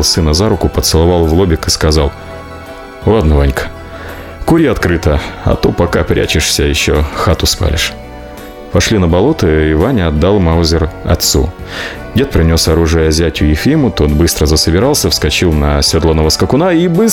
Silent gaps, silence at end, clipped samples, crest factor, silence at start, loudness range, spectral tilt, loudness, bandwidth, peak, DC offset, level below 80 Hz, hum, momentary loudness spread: none; 0 s; under 0.1%; 10 dB; 0 s; 3 LU; -5 dB/octave; -11 LUFS; 17.5 kHz; 0 dBFS; under 0.1%; -22 dBFS; none; 12 LU